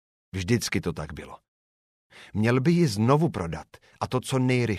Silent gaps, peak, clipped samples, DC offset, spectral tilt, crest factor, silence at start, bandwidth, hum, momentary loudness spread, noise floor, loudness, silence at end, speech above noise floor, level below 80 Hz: 1.48-2.10 s; -8 dBFS; under 0.1%; under 0.1%; -6 dB/octave; 18 dB; 0.35 s; 15 kHz; none; 16 LU; under -90 dBFS; -25 LUFS; 0 s; over 65 dB; -52 dBFS